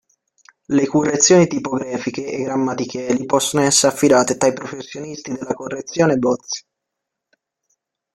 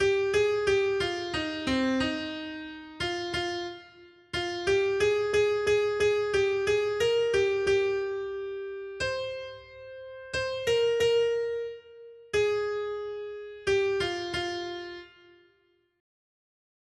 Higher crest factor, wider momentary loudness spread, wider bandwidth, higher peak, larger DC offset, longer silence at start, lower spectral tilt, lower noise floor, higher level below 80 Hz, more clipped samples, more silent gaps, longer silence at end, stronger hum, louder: about the same, 18 dB vs 14 dB; about the same, 15 LU vs 14 LU; first, 15.5 kHz vs 12 kHz; first, 0 dBFS vs -14 dBFS; neither; first, 0.7 s vs 0 s; about the same, -4 dB/octave vs -4 dB/octave; first, -81 dBFS vs -69 dBFS; about the same, -58 dBFS vs -56 dBFS; neither; neither; second, 1.55 s vs 1.95 s; neither; first, -18 LUFS vs -28 LUFS